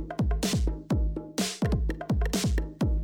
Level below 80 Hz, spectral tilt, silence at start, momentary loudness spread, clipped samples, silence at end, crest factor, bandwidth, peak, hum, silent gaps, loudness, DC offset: -30 dBFS; -5.5 dB/octave; 0 s; 3 LU; under 0.1%; 0 s; 14 dB; 17.5 kHz; -14 dBFS; none; none; -29 LUFS; under 0.1%